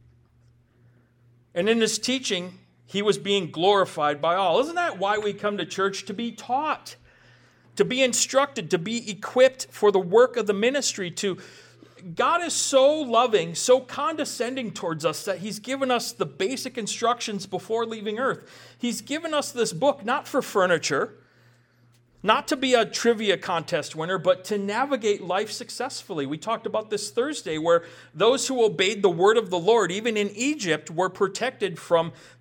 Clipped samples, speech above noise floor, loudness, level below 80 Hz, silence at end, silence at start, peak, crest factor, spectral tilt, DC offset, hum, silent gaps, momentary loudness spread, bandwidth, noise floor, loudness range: under 0.1%; 36 dB; -24 LUFS; -70 dBFS; 0.25 s; 1.55 s; -4 dBFS; 20 dB; -3 dB/octave; under 0.1%; none; none; 10 LU; 18.5 kHz; -60 dBFS; 5 LU